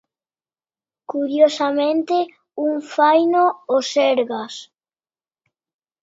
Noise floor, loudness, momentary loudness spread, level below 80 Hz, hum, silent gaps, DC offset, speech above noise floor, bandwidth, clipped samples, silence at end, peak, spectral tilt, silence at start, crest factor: under -90 dBFS; -19 LUFS; 13 LU; -78 dBFS; none; none; under 0.1%; over 72 dB; 7.8 kHz; under 0.1%; 1.4 s; -2 dBFS; -3 dB/octave; 1.1 s; 18 dB